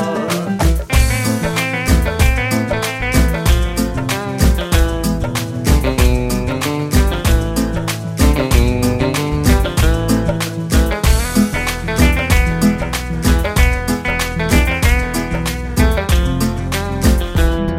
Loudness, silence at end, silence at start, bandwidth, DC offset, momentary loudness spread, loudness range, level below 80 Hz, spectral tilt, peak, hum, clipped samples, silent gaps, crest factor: -16 LUFS; 0 s; 0 s; 16.5 kHz; under 0.1%; 5 LU; 1 LU; -18 dBFS; -5 dB/octave; 0 dBFS; none; under 0.1%; none; 14 dB